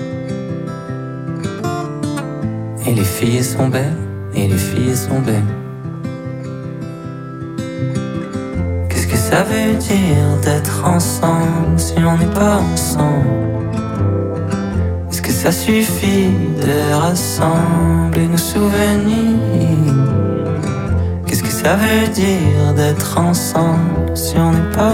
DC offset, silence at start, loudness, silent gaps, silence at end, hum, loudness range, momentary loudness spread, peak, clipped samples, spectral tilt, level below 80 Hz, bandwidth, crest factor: under 0.1%; 0 s; -16 LUFS; none; 0 s; none; 6 LU; 11 LU; -2 dBFS; under 0.1%; -6 dB/octave; -32 dBFS; 17 kHz; 12 dB